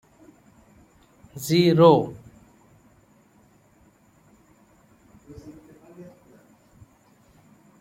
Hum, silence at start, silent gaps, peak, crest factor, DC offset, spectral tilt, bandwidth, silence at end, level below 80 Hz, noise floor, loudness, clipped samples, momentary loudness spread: none; 1.35 s; none; -2 dBFS; 26 dB; under 0.1%; -6.5 dB/octave; 16.5 kHz; 1.8 s; -62 dBFS; -58 dBFS; -19 LUFS; under 0.1%; 31 LU